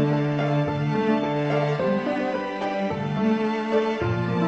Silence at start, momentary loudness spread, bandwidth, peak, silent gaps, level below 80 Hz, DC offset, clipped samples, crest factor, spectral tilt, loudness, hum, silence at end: 0 s; 4 LU; 7.8 kHz; -10 dBFS; none; -54 dBFS; under 0.1%; under 0.1%; 14 dB; -8 dB/octave; -24 LUFS; none; 0 s